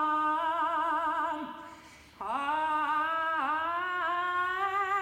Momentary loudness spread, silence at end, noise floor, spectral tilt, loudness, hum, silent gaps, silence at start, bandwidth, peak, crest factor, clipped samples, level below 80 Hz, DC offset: 8 LU; 0 s; -52 dBFS; -3.5 dB/octave; -30 LUFS; none; none; 0 s; 16.5 kHz; -18 dBFS; 12 dB; under 0.1%; -68 dBFS; under 0.1%